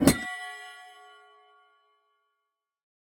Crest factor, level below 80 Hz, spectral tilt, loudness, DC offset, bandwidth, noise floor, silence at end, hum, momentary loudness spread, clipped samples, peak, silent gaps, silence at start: 28 dB; -52 dBFS; -4.5 dB/octave; -31 LUFS; under 0.1%; 19.5 kHz; -84 dBFS; 2.2 s; none; 25 LU; under 0.1%; -4 dBFS; none; 0 s